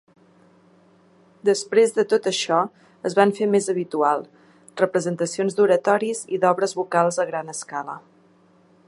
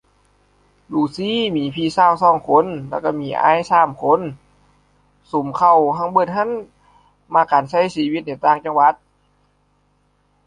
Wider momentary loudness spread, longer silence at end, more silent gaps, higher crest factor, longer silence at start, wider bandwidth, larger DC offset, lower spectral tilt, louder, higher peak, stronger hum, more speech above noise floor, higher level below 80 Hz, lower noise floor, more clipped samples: about the same, 11 LU vs 10 LU; second, 0.9 s vs 1.5 s; neither; about the same, 20 dB vs 18 dB; first, 1.45 s vs 0.9 s; first, 11.5 kHz vs 10 kHz; neither; second, -4.5 dB/octave vs -6 dB/octave; second, -22 LUFS vs -17 LUFS; about the same, -2 dBFS vs -2 dBFS; second, none vs 50 Hz at -55 dBFS; second, 35 dB vs 45 dB; second, -76 dBFS vs -58 dBFS; second, -56 dBFS vs -61 dBFS; neither